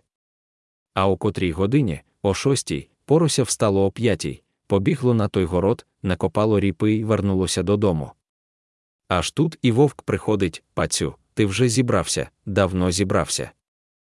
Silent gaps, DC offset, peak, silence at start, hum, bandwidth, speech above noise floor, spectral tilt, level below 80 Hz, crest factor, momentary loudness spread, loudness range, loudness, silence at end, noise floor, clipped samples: 8.29-8.99 s; under 0.1%; -4 dBFS; 0.95 s; none; 12 kHz; over 69 dB; -5.5 dB/octave; -50 dBFS; 18 dB; 7 LU; 2 LU; -22 LUFS; 0.55 s; under -90 dBFS; under 0.1%